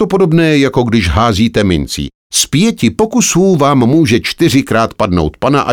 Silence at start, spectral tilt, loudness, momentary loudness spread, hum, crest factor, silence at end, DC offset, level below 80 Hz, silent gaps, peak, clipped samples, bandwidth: 0 s; -5 dB/octave; -11 LUFS; 4 LU; none; 10 dB; 0 s; 0.3%; -30 dBFS; 2.15-2.30 s; 0 dBFS; under 0.1%; 18.5 kHz